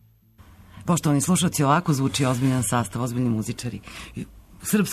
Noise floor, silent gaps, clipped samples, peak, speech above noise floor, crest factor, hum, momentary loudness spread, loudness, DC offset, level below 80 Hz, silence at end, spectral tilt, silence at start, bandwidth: -53 dBFS; none; under 0.1%; -8 dBFS; 30 dB; 16 dB; none; 17 LU; -23 LUFS; under 0.1%; -50 dBFS; 0 s; -5 dB/octave; 0.75 s; 13.5 kHz